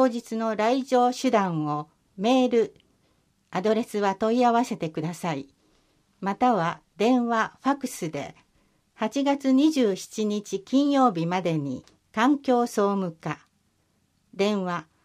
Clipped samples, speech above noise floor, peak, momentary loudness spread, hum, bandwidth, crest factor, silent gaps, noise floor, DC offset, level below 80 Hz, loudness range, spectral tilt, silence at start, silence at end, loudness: under 0.1%; 45 dB; -8 dBFS; 12 LU; none; 15 kHz; 16 dB; none; -69 dBFS; under 0.1%; -70 dBFS; 3 LU; -5.5 dB/octave; 0 s; 0.2 s; -25 LUFS